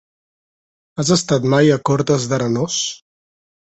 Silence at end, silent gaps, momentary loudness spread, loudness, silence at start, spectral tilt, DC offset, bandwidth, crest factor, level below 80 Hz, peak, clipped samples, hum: 0.8 s; none; 10 LU; -17 LUFS; 0.95 s; -5 dB/octave; under 0.1%; 8.4 kHz; 18 dB; -54 dBFS; -2 dBFS; under 0.1%; none